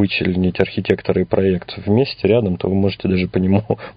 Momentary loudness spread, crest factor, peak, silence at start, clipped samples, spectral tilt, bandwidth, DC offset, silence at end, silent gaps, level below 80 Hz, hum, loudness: 3 LU; 18 dB; 0 dBFS; 0 s; under 0.1%; -9.5 dB/octave; 5.2 kHz; under 0.1%; 0.05 s; none; -38 dBFS; none; -18 LUFS